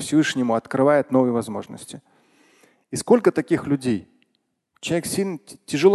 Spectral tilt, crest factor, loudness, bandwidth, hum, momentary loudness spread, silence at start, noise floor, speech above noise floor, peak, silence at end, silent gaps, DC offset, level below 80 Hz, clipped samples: -5.5 dB/octave; 18 dB; -22 LUFS; 12.5 kHz; none; 17 LU; 0 s; -72 dBFS; 51 dB; -4 dBFS; 0 s; none; under 0.1%; -60 dBFS; under 0.1%